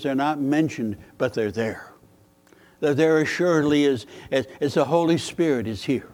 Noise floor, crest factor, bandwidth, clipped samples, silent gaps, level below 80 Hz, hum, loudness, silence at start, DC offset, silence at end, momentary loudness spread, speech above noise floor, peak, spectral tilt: -56 dBFS; 16 dB; 16.5 kHz; under 0.1%; none; -60 dBFS; none; -23 LUFS; 0 s; under 0.1%; 0.05 s; 9 LU; 33 dB; -6 dBFS; -6 dB/octave